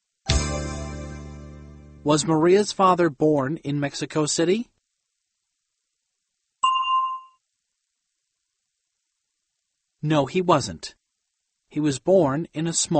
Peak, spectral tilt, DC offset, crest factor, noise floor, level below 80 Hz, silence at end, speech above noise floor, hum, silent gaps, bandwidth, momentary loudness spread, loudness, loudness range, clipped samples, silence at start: -2 dBFS; -5 dB/octave; under 0.1%; 22 dB; -79 dBFS; -42 dBFS; 0 s; 58 dB; none; none; 8.8 kHz; 18 LU; -22 LUFS; 7 LU; under 0.1%; 0.25 s